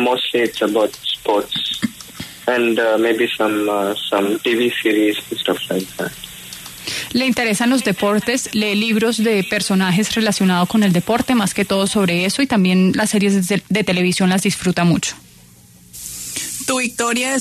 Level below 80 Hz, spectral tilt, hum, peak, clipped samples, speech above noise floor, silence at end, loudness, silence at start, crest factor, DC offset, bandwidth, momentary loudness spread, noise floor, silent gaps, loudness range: -52 dBFS; -4.5 dB/octave; none; -4 dBFS; under 0.1%; 28 dB; 0 s; -17 LUFS; 0 s; 12 dB; under 0.1%; 13.5 kHz; 9 LU; -45 dBFS; none; 4 LU